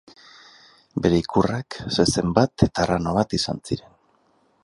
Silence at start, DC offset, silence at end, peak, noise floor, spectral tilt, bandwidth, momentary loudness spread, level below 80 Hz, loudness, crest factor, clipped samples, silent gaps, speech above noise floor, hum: 0.95 s; under 0.1%; 0.85 s; -2 dBFS; -63 dBFS; -5.5 dB/octave; 11.5 kHz; 10 LU; -42 dBFS; -22 LUFS; 22 dB; under 0.1%; none; 41 dB; none